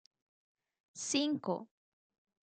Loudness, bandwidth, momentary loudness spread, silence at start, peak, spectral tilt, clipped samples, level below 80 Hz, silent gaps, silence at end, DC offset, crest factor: -36 LUFS; 9.4 kHz; 11 LU; 0.95 s; -20 dBFS; -3 dB/octave; under 0.1%; under -90 dBFS; none; 0.9 s; under 0.1%; 20 dB